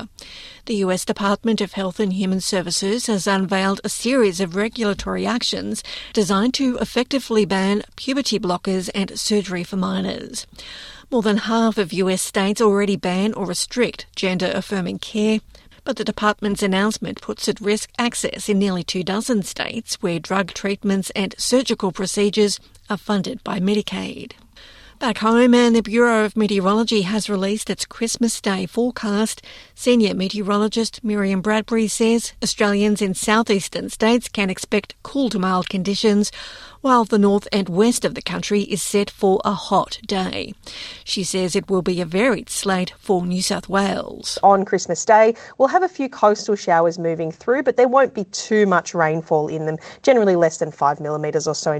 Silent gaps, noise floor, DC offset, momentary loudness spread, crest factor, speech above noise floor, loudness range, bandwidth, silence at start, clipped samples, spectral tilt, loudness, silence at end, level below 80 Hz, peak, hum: none; -45 dBFS; under 0.1%; 9 LU; 18 dB; 25 dB; 4 LU; 13.5 kHz; 0 s; under 0.1%; -4.5 dB/octave; -20 LUFS; 0 s; -50 dBFS; -2 dBFS; none